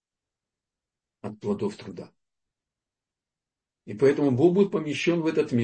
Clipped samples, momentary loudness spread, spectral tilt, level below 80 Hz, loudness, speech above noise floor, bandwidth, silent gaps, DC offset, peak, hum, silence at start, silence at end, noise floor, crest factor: under 0.1%; 20 LU; -7 dB/octave; -70 dBFS; -24 LUFS; 66 dB; 8.6 kHz; none; under 0.1%; -8 dBFS; none; 1.25 s; 0 s; -90 dBFS; 18 dB